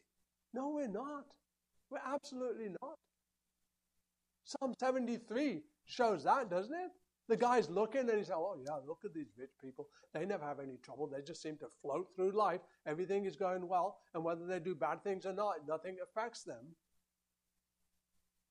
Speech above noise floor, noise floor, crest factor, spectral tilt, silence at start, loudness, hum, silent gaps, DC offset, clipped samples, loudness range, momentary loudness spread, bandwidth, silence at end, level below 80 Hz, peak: 49 dB; -89 dBFS; 20 dB; -5.5 dB/octave; 0.55 s; -40 LUFS; none; none; under 0.1%; under 0.1%; 9 LU; 15 LU; 11 kHz; 1.8 s; -86 dBFS; -20 dBFS